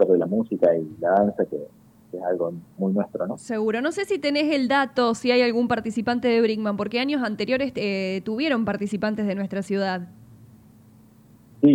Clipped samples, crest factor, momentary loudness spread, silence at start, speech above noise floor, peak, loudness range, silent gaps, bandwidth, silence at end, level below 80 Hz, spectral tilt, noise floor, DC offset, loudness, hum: under 0.1%; 16 dB; 8 LU; 0 s; 29 dB; -6 dBFS; 5 LU; none; 15 kHz; 0 s; -62 dBFS; -6 dB/octave; -52 dBFS; under 0.1%; -24 LUFS; none